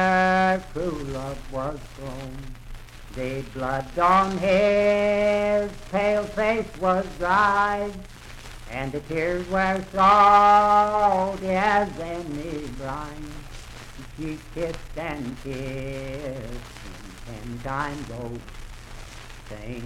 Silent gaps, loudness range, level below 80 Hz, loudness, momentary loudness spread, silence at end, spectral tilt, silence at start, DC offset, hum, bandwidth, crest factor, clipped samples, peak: none; 14 LU; -42 dBFS; -23 LUFS; 22 LU; 0 s; -5.5 dB/octave; 0 s; under 0.1%; none; 15.5 kHz; 18 dB; under 0.1%; -6 dBFS